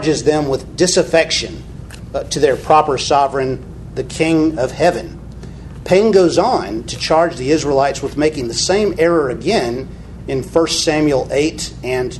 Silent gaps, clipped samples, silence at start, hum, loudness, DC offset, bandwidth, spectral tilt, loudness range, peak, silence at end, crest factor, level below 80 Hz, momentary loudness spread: none; under 0.1%; 0 s; none; -15 LUFS; under 0.1%; 12.5 kHz; -4.5 dB/octave; 2 LU; 0 dBFS; 0 s; 16 dB; -36 dBFS; 15 LU